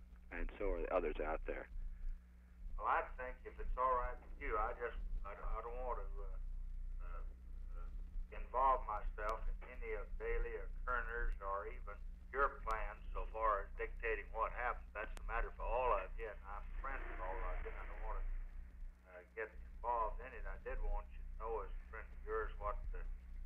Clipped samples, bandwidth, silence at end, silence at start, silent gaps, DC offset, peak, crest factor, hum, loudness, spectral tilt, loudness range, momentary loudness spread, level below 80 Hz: under 0.1%; 3.8 kHz; 0 s; 0 s; none; under 0.1%; -22 dBFS; 20 dB; 60 Hz at -60 dBFS; -44 LUFS; -7 dB/octave; 6 LU; 15 LU; -46 dBFS